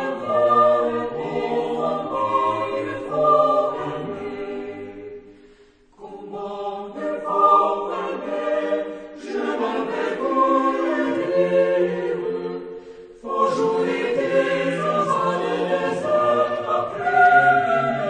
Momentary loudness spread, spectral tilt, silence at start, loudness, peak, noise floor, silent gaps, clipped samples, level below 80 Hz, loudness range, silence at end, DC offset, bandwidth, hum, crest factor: 15 LU; -6 dB/octave; 0 s; -21 LUFS; -4 dBFS; -52 dBFS; none; under 0.1%; -60 dBFS; 4 LU; 0 s; under 0.1%; 9.6 kHz; none; 18 dB